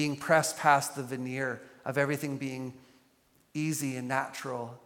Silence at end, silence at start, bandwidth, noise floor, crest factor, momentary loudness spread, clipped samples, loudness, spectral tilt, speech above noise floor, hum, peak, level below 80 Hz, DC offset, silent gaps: 0.1 s; 0 s; 17.5 kHz; -67 dBFS; 24 dB; 13 LU; under 0.1%; -31 LUFS; -4.5 dB/octave; 36 dB; none; -8 dBFS; -76 dBFS; under 0.1%; none